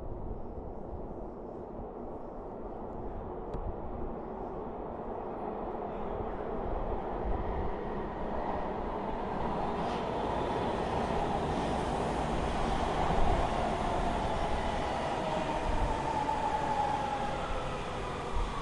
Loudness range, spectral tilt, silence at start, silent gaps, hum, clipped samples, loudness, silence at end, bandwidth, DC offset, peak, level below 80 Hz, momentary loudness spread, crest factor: 9 LU; -6 dB/octave; 0 s; none; none; under 0.1%; -35 LUFS; 0 s; 11.5 kHz; under 0.1%; -16 dBFS; -40 dBFS; 11 LU; 18 dB